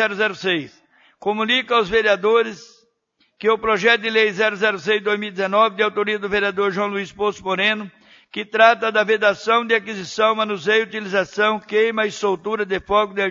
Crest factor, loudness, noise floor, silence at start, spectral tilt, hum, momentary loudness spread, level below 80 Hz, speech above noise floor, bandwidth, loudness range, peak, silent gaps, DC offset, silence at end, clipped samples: 20 dB; -19 LUFS; -65 dBFS; 0 s; -4 dB/octave; none; 8 LU; -56 dBFS; 46 dB; 7.6 kHz; 2 LU; 0 dBFS; none; under 0.1%; 0 s; under 0.1%